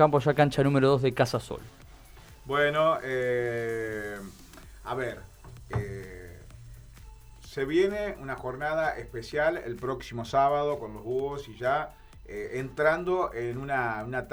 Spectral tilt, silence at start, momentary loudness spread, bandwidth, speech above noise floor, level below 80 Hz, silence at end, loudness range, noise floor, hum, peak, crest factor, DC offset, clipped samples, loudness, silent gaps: -6.5 dB/octave; 0 s; 19 LU; 19.5 kHz; 22 dB; -50 dBFS; 0 s; 9 LU; -50 dBFS; none; -6 dBFS; 22 dB; under 0.1%; under 0.1%; -28 LUFS; none